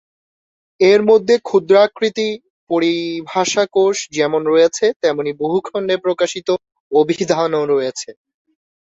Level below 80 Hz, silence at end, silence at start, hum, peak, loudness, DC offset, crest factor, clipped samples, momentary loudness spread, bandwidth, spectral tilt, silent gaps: -62 dBFS; 0.85 s; 0.8 s; none; 0 dBFS; -16 LUFS; under 0.1%; 16 dB; under 0.1%; 9 LU; 8 kHz; -4 dB/octave; 2.50-2.67 s, 4.96-5.00 s, 6.80-6.90 s